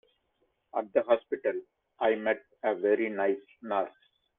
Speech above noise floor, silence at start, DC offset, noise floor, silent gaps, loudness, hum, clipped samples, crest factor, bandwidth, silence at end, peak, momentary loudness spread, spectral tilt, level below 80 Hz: 46 dB; 0.75 s; under 0.1%; -75 dBFS; none; -30 LUFS; none; under 0.1%; 20 dB; 3.9 kHz; 0.5 s; -12 dBFS; 10 LU; -8 dB/octave; -76 dBFS